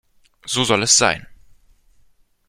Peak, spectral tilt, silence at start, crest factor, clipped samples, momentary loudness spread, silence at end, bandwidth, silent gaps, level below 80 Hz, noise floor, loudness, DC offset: 0 dBFS; -1.5 dB/octave; 0.45 s; 22 dB; under 0.1%; 15 LU; 1.15 s; 15.5 kHz; none; -52 dBFS; -55 dBFS; -16 LUFS; under 0.1%